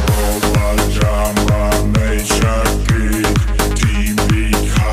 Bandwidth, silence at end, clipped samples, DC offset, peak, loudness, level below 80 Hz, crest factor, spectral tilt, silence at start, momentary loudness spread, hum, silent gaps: 16 kHz; 0 s; under 0.1%; under 0.1%; 0 dBFS; -15 LUFS; -18 dBFS; 14 dB; -5 dB/octave; 0 s; 1 LU; none; none